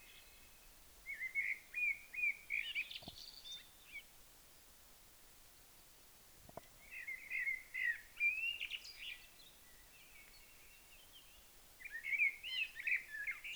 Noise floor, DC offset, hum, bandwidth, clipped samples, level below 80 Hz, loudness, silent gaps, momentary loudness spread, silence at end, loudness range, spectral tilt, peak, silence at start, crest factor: -63 dBFS; under 0.1%; none; over 20 kHz; under 0.1%; -70 dBFS; -40 LUFS; none; 24 LU; 0 s; 14 LU; 0 dB/octave; -26 dBFS; 0 s; 20 dB